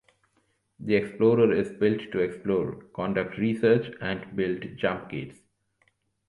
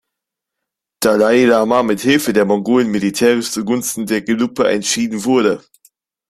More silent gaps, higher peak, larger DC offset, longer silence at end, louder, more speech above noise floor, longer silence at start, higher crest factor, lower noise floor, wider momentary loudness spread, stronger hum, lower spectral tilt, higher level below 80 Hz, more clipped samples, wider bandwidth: neither; second, -8 dBFS vs -2 dBFS; neither; first, 0.95 s vs 0.7 s; second, -26 LUFS vs -15 LUFS; second, 45 dB vs 66 dB; second, 0.8 s vs 1 s; first, 20 dB vs 14 dB; second, -71 dBFS vs -81 dBFS; first, 12 LU vs 7 LU; neither; first, -8 dB/octave vs -4 dB/octave; about the same, -60 dBFS vs -56 dBFS; neither; second, 11 kHz vs 15.5 kHz